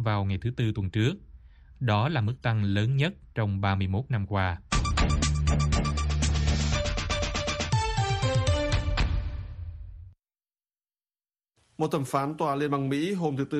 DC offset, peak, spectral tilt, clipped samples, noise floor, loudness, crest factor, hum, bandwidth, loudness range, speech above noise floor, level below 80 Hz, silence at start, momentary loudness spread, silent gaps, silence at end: under 0.1%; -10 dBFS; -5.5 dB/octave; under 0.1%; under -90 dBFS; -28 LUFS; 18 dB; none; 12 kHz; 7 LU; over 63 dB; -34 dBFS; 0 s; 6 LU; none; 0 s